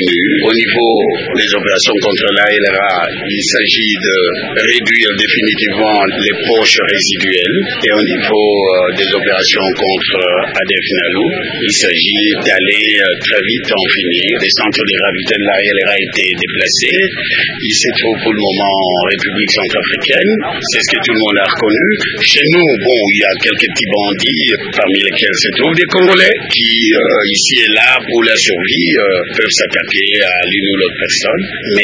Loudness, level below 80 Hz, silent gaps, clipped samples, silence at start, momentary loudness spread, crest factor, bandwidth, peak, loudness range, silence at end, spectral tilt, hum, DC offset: -10 LUFS; -48 dBFS; none; 0.2%; 0 s; 4 LU; 12 dB; 8 kHz; 0 dBFS; 2 LU; 0 s; -2.5 dB/octave; none; under 0.1%